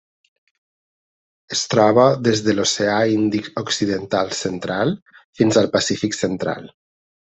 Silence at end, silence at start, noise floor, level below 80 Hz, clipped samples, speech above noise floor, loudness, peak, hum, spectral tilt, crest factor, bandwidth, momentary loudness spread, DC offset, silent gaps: 0.65 s; 1.5 s; under -90 dBFS; -60 dBFS; under 0.1%; over 72 dB; -19 LUFS; -2 dBFS; none; -4.5 dB/octave; 18 dB; 8.4 kHz; 10 LU; under 0.1%; 5.02-5.06 s, 5.24-5.33 s